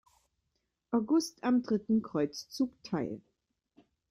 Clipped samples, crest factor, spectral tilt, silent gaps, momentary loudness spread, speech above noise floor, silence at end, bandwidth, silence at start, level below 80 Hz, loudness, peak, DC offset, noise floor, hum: under 0.1%; 16 dB; -5.5 dB/octave; none; 7 LU; 51 dB; 0.9 s; 15.5 kHz; 0.9 s; -72 dBFS; -32 LUFS; -18 dBFS; under 0.1%; -82 dBFS; none